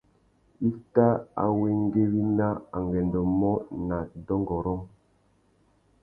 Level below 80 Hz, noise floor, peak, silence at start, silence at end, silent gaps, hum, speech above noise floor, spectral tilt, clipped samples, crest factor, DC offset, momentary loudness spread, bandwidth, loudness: -48 dBFS; -65 dBFS; -8 dBFS; 0.6 s; 1.15 s; none; none; 40 dB; -12.5 dB/octave; under 0.1%; 20 dB; under 0.1%; 8 LU; 2.5 kHz; -27 LUFS